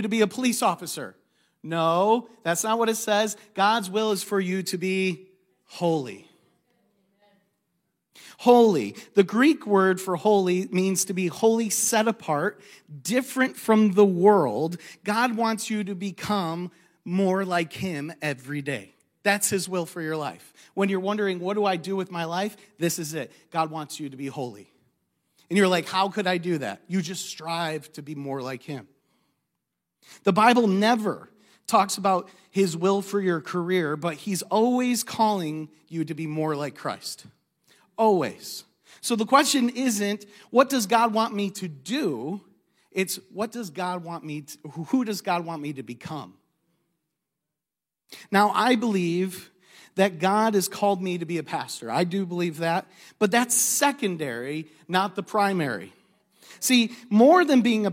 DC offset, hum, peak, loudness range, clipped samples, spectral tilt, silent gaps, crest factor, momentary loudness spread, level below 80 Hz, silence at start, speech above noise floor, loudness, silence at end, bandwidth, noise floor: under 0.1%; none; -2 dBFS; 8 LU; under 0.1%; -4.5 dB/octave; none; 22 dB; 15 LU; -76 dBFS; 0 s; 65 dB; -24 LUFS; 0 s; 16.5 kHz; -89 dBFS